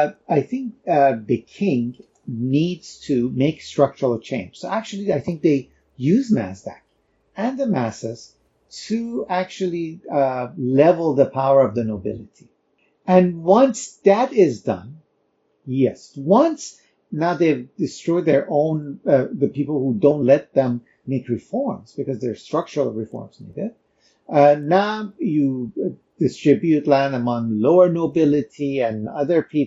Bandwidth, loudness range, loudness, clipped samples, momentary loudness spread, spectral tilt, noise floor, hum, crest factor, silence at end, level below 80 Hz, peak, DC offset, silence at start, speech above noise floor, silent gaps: 8 kHz; 6 LU; -20 LUFS; under 0.1%; 14 LU; -7 dB/octave; -66 dBFS; none; 18 dB; 0 s; -62 dBFS; -2 dBFS; under 0.1%; 0 s; 47 dB; none